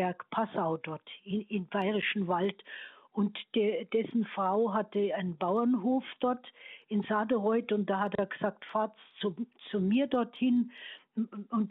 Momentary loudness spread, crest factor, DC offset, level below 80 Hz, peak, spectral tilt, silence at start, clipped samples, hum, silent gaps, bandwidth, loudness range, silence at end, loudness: 10 LU; 14 dB; under 0.1%; -76 dBFS; -16 dBFS; -9.5 dB/octave; 0 s; under 0.1%; none; none; 4.1 kHz; 2 LU; 0 s; -32 LUFS